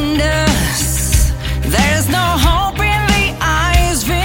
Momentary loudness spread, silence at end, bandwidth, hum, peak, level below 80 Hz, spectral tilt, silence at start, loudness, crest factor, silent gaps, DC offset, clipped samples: 2 LU; 0 s; 17 kHz; none; 0 dBFS; -18 dBFS; -4 dB/octave; 0 s; -14 LUFS; 14 dB; none; under 0.1%; under 0.1%